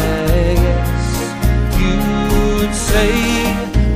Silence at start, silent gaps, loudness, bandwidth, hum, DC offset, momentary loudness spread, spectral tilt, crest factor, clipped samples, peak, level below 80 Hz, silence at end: 0 s; none; -16 LUFS; 15.5 kHz; none; under 0.1%; 4 LU; -5.5 dB/octave; 12 dB; under 0.1%; -2 dBFS; -18 dBFS; 0 s